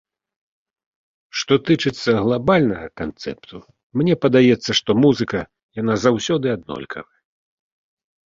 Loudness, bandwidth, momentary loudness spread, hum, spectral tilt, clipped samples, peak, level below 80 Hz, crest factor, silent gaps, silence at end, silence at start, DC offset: -19 LUFS; 7.6 kHz; 15 LU; none; -5.5 dB/octave; under 0.1%; -2 dBFS; -52 dBFS; 18 dB; 3.83-3.90 s, 5.63-5.69 s; 1.25 s; 1.35 s; under 0.1%